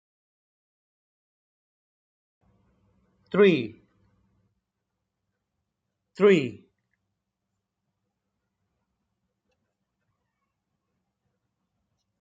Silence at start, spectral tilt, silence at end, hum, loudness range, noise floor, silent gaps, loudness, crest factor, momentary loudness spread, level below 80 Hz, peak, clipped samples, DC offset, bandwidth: 3.35 s; -7 dB/octave; 5.65 s; none; 0 LU; -83 dBFS; none; -22 LUFS; 24 dB; 14 LU; -76 dBFS; -8 dBFS; under 0.1%; under 0.1%; 7.6 kHz